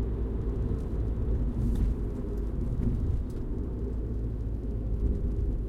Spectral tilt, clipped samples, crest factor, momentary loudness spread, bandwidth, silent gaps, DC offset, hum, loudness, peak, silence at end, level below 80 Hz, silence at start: -10 dB/octave; under 0.1%; 12 dB; 4 LU; 3.9 kHz; none; under 0.1%; none; -33 LUFS; -16 dBFS; 0 s; -30 dBFS; 0 s